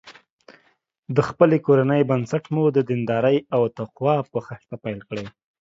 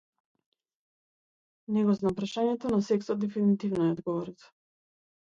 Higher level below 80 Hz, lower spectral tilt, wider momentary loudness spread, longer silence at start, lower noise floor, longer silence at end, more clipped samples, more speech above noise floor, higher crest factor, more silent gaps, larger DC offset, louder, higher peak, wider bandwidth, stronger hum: first, -60 dBFS vs -66 dBFS; about the same, -8.5 dB/octave vs -7.5 dB/octave; first, 14 LU vs 6 LU; second, 0.05 s vs 1.7 s; second, -64 dBFS vs under -90 dBFS; second, 0.3 s vs 0.9 s; neither; second, 44 dB vs over 62 dB; about the same, 20 dB vs 16 dB; first, 0.30-0.39 s vs none; neither; first, -21 LUFS vs -29 LUFS; first, -2 dBFS vs -16 dBFS; about the same, 7.8 kHz vs 7.6 kHz; neither